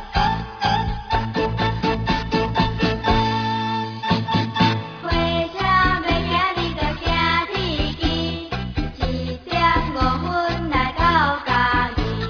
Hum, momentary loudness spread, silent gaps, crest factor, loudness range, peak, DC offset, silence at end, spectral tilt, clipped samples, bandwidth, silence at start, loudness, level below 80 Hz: none; 7 LU; none; 16 dB; 2 LU; -4 dBFS; under 0.1%; 0 s; -6 dB/octave; under 0.1%; 5.4 kHz; 0 s; -21 LUFS; -30 dBFS